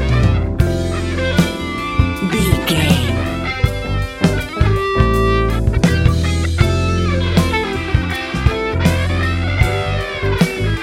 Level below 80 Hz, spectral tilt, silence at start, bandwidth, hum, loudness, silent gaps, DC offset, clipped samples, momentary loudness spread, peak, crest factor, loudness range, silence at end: -22 dBFS; -6 dB/octave; 0 s; 16 kHz; none; -17 LUFS; none; under 0.1%; under 0.1%; 5 LU; 0 dBFS; 16 dB; 2 LU; 0 s